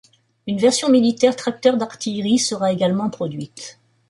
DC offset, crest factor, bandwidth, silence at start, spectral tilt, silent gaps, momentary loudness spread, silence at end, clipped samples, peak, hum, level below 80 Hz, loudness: under 0.1%; 18 dB; 11.5 kHz; 0.45 s; -4.5 dB/octave; none; 17 LU; 0.4 s; under 0.1%; -2 dBFS; none; -64 dBFS; -19 LUFS